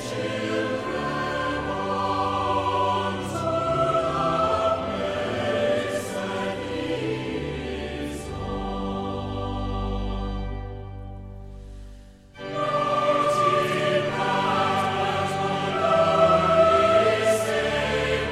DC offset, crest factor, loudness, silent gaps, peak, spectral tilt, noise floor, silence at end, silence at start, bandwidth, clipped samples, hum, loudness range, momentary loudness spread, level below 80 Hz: under 0.1%; 18 dB; -24 LUFS; none; -8 dBFS; -5 dB/octave; -45 dBFS; 0 s; 0 s; 15 kHz; under 0.1%; none; 10 LU; 13 LU; -40 dBFS